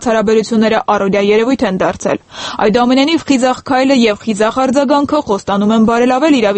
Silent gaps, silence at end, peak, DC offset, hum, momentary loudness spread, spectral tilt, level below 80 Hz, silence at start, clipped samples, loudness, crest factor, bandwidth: none; 0 s; 0 dBFS; under 0.1%; none; 5 LU; -5 dB/octave; -44 dBFS; 0 s; under 0.1%; -12 LUFS; 12 dB; 8.8 kHz